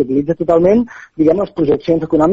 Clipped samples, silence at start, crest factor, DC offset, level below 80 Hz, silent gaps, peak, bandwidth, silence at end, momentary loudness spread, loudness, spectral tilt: under 0.1%; 0 s; 14 dB; under 0.1%; -42 dBFS; none; 0 dBFS; 7.4 kHz; 0 s; 5 LU; -14 LUFS; -8 dB/octave